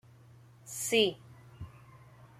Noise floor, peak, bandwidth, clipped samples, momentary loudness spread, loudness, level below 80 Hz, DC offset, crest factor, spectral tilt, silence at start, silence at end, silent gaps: -57 dBFS; -14 dBFS; 15 kHz; under 0.1%; 24 LU; -30 LUFS; -66 dBFS; under 0.1%; 22 dB; -2.5 dB/octave; 0.65 s; 0.15 s; none